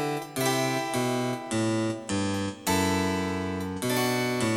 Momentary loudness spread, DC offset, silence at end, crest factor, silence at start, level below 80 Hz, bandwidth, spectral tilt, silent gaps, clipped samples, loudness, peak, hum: 5 LU; under 0.1%; 0 s; 14 dB; 0 s; -60 dBFS; 17 kHz; -4.5 dB/octave; none; under 0.1%; -28 LUFS; -14 dBFS; none